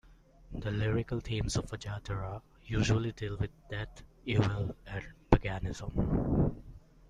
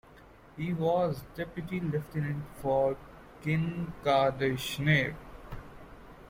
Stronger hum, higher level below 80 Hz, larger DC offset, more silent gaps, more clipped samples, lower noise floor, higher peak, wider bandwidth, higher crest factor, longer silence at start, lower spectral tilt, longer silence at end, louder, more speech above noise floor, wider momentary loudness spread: neither; first, -42 dBFS vs -54 dBFS; neither; neither; neither; about the same, -56 dBFS vs -54 dBFS; first, -4 dBFS vs -12 dBFS; second, 11 kHz vs 16.5 kHz; first, 30 dB vs 18 dB; about the same, 0.1 s vs 0.1 s; about the same, -6.5 dB/octave vs -6.5 dB/octave; first, 0.3 s vs 0 s; second, -34 LUFS vs -31 LUFS; about the same, 23 dB vs 24 dB; second, 13 LU vs 20 LU